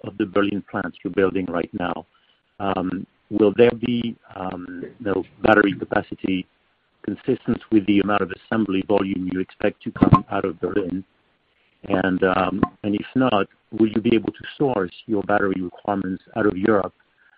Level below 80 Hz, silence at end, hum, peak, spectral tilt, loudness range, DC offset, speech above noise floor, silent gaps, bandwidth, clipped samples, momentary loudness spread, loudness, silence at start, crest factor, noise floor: -50 dBFS; 0.5 s; none; 0 dBFS; -5.5 dB/octave; 2 LU; under 0.1%; 42 dB; none; 5 kHz; under 0.1%; 12 LU; -22 LUFS; 0.05 s; 22 dB; -64 dBFS